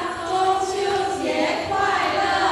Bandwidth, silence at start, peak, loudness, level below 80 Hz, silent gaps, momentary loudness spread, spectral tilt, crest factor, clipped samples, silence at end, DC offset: 13 kHz; 0 s; -8 dBFS; -22 LUFS; -52 dBFS; none; 3 LU; -3 dB/octave; 14 dB; under 0.1%; 0 s; under 0.1%